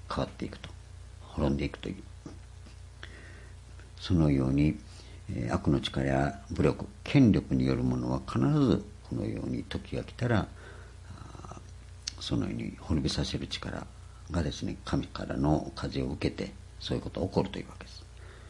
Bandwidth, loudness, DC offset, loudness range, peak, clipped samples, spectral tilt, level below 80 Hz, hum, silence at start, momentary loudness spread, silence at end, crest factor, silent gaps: 11.5 kHz; -31 LUFS; under 0.1%; 8 LU; -10 dBFS; under 0.1%; -6.5 dB/octave; -46 dBFS; none; 0.05 s; 22 LU; 0 s; 22 dB; none